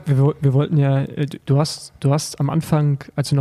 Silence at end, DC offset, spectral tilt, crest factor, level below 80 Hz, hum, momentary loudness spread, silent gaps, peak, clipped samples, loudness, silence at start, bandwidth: 0 s; under 0.1%; -7 dB/octave; 14 dB; -52 dBFS; none; 6 LU; none; -4 dBFS; under 0.1%; -19 LUFS; 0 s; 13 kHz